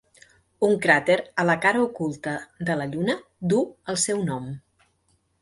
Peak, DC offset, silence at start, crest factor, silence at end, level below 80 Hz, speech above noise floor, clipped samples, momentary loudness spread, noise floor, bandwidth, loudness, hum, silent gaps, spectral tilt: -4 dBFS; under 0.1%; 0.6 s; 22 dB; 0.8 s; -62 dBFS; 44 dB; under 0.1%; 12 LU; -68 dBFS; 11.5 kHz; -24 LUFS; none; none; -4.5 dB/octave